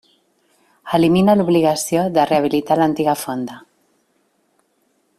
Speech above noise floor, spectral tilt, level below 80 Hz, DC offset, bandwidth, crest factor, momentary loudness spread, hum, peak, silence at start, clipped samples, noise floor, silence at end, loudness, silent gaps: 48 dB; -5.5 dB/octave; -56 dBFS; under 0.1%; 15.5 kHz; 16 dB; 9 LU; none; -2 dBFS; 0.85 s; under 0.1%; -64 dBFS; 1.6 s; -17 LUFS; none